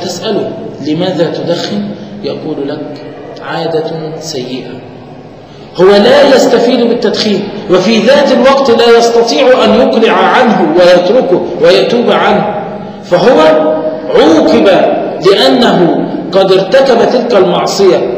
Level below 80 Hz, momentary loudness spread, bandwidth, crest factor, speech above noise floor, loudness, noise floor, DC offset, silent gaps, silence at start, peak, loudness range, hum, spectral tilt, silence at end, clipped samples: -44 dBFS; 14 LU; 16 kHz; 8 dB; 23 dB; -8 LUFS; -30 dBFS; 0.2%; none; 0 s; 0 dBFS; 10 LU; none; -5 dB/octave; 0 s; 2%